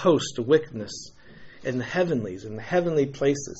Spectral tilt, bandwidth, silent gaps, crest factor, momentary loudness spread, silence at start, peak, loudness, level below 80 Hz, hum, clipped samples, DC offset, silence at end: -5.5 dB/octave; 8 kHz; none; 18 dB; 14 LU; 0 s; -8 dBFS; -26 LUFS; -56 dBFS; none; under 0.1%; under 0.1%; 0 s